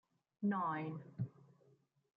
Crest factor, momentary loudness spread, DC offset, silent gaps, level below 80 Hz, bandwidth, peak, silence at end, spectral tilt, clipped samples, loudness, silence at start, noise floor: 16 dB; 9 LU; under 0.1%; none; -84 dBFS; 4.8 kHz; -28 dBFS; 0.7 s; -10 dB/octave; under 0.1%; -42 LUFS; 0.4 s; -73 dBFS